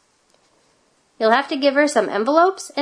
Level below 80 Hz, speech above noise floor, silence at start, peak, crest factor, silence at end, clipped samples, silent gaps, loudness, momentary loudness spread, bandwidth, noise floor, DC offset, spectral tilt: -74 dBFS; 43 dB; 1.2 s; -2 dBFS; 18 dB; 0 s; under 0.1%; none; -18 LUFS; 3 LU; 11 kHz; -61 dBFS; under 0.1%; -3 dB/octave